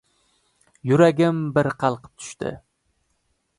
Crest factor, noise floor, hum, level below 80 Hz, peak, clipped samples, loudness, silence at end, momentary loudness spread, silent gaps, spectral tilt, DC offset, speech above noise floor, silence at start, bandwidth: 20 dB; -70 dBFS; none; -60 dBFS; -4 dBFS; under 0.1%; -21 LUFS; 1.05 s; 16 LU; none; -7 dB/octave; under 0.1%; 50 dB; 0.85 s; 11.5 kHz